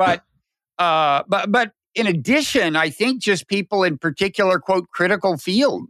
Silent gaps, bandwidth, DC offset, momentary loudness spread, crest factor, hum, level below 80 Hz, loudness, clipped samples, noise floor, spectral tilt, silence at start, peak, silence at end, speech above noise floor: none; 14 kHz; under 0.1%; 4 LU; 16 dB; none; -58 dBFS; -19 LUFS; under 0.1%; -71 dBFS; -4.5 dB/octave; 0 s; -4 dBFS; 0.05 s; 52 dB